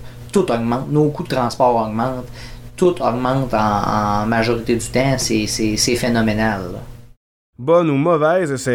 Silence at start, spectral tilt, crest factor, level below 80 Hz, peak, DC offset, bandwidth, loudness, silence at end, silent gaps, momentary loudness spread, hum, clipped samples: 0 s; -5 dB/octave; 16 dB; -38 dBFS; -2 dBFS; 0.7%; 17 kHz; -18 LUFS; 0 s; 7.17-7.53 s; 8 LU; none; under 0.1%